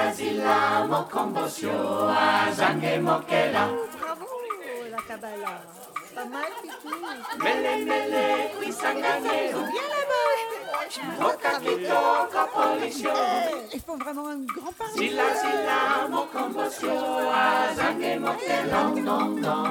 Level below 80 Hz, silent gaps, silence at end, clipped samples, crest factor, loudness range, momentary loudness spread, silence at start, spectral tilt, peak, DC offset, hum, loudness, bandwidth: -66 dBFS; none; 0 s; under 0.1%; 18 dB; 6 LU; 12 LU; 0 s; -4 dB/octave; -6 dBFS; under 0.1%; none; -26 LUFS; 19.5 kHz